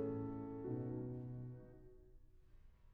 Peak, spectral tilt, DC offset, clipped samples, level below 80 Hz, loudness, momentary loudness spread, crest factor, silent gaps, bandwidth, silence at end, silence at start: -32 dBFS; -12 dB/octave; under 0.1%; under 0.1%; -64 dBFS; -47 LUFS; 19 LU; 16 dB; none; 3 kHz; 0 s; 0 s